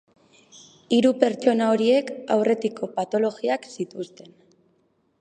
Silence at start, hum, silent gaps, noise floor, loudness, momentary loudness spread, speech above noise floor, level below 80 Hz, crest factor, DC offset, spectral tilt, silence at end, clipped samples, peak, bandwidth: 0.9 s; none; none; -66 dBFS; -23 LUFS; 13 LU; 44 dB; -74 dBFS; 22 dB; under 0.1%; -5.5 dB/octave; 1.15 s; under 0.1%; -2 dBFS; 10 kHz